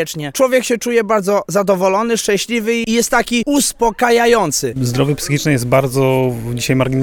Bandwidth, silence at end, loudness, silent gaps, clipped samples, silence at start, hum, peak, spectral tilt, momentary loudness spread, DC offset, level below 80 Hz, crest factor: 19.5 kHz; 0 s; -15 LUFS; none; under 0.1%; 0 s; none; 0 dBFS; -4.5 dB/octave; 4 LU; under 0.1%; -42 dBFS; 14 dB